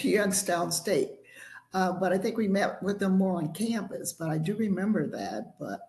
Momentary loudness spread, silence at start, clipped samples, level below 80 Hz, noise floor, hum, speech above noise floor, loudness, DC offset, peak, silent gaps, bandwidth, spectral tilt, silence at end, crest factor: 10 LU; 0 s; under 0.1%; -68 dBFS; -50 dBFS; none; 21 dB; -29 LUFS; under 0.1%; -12 dBFS; none; 13 kHz; -5 dB/octave; 0.05 s; 16 dB